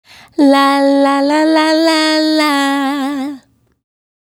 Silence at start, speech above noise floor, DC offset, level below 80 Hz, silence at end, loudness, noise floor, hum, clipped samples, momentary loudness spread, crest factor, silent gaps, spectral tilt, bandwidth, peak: 0.4 s; 27 dB; under 0.1%; -64 dBFS; 0.95 s; -12 LUFS; -38 dBFS; none; under 0.1%; 9 LU; 14 dB; none; -2 dB/octave; 17 kHz; 0 dBFS